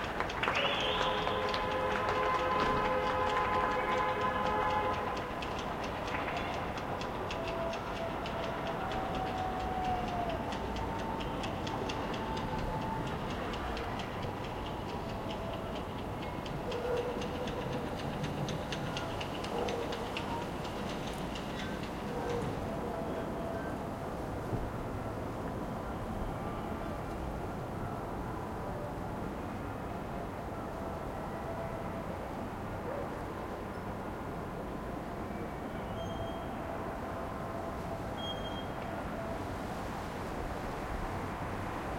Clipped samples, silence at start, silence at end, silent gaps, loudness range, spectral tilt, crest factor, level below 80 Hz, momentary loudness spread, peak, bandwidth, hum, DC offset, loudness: under 0.1%; 0 s; 0 s; none; 8 LU; -5.5 dB/octave; 22 dB; -48 dBFS; 9 LU; -16 dBFS; 16.5 kHz; none; under 0.1%; -36 LUFS